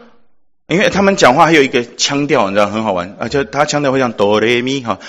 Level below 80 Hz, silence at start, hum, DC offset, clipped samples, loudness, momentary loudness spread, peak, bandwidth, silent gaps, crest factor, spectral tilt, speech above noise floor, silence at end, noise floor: -48 dBFS; 0.7 s; none; under 0.1%; 0.5%; -13 LUFS; 9 LU; 0 dBFS; 13.5 kHz; none; 14 dB; -4 dB/octave; 40 dB; 0 s; -53 dBFS